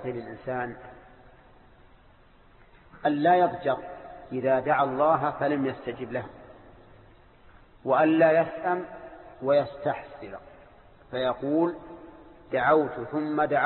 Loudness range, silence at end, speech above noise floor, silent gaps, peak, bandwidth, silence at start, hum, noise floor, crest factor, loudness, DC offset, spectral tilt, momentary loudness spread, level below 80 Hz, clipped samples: 4 LU; 0 s; 30 dB; none; -10 dBFS; 4.3 kHz; 0 s; none; -56 dBFS; 18 dB; -26 LUFS; under 0.1%; -10.5 dB/octave; 20 LU; -60 dBFS; under 0.1%